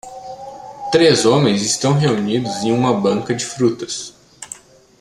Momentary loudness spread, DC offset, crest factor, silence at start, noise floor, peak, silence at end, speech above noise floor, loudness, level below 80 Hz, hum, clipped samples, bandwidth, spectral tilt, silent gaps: 20 LU; under 0.1%; 18 dB; 0.05 s; -39 dBFS; 0 dBFS; 0.45 s; 23 dB; -16 LUFS; -54 dBFS; none; under 0.1%; 13 kHz; -4.5 dB/octave; none